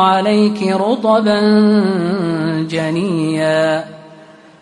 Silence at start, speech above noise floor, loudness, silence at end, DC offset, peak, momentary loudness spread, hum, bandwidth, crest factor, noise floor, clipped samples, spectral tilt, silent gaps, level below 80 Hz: 0 s; 27 dB; -14 LUFS; 0.4 s; under 0.1%; -2 dBFS; 7 LU; none; 11 kHz; 12 dB; -40 dBFS; under 0.1%; -6.5 dB/octave; none; -58 dBFS